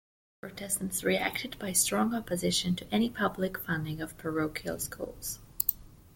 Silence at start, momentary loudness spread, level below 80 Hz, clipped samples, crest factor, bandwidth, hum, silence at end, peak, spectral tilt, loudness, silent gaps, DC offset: 0.45 s; 11 LU; -56 dBFS; under 0.1%; 26 dB; 17 kHz; none; 0.1 s; -6 dBFS; -3.5 dB/octave; -31 LUFS; none; under 0.1%